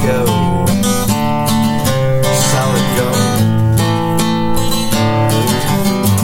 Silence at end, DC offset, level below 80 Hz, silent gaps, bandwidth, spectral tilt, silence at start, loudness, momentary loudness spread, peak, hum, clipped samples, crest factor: 0 s; under 0.1%; -30 dBFS; none; 17 kHz; -5 dB/octave; 0 s; -14 LUFS; 2 LU; -2 dBFS; none; under 0.1%; 10 dB